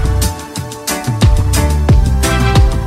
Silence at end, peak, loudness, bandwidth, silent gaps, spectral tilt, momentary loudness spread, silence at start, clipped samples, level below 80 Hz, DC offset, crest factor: 0 s; 0 dBFS; -13 LUFS; 16 kHz; none; -5 dB/octave; 9 LU; 0 s; under 0.1%; -14 dBFS; under 0.1%; 10 dB